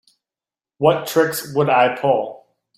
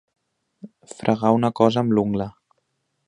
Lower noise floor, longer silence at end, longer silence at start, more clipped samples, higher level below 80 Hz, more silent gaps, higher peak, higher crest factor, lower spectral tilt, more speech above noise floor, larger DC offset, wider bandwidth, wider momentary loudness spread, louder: first, under -90 dBFS vs -73 dBFS; second, 0.4 s vs 0.75 s; first, 0.8 s vs 0.65 s; neither; second, -64 dBFS vs -56 dBFS; neither; about the same, -2 dBFS vs -2 dBFS; about the same, 18 dB vs 22 dB; second, -5 dB/octave vs -7.5 dB/octave; first, over 73 dB vs 53 dB; neither; first, 16 kHz vs 10 kHz; second, 5 LU vs 12 LU; first, -18 LUFS vs -21 LUFS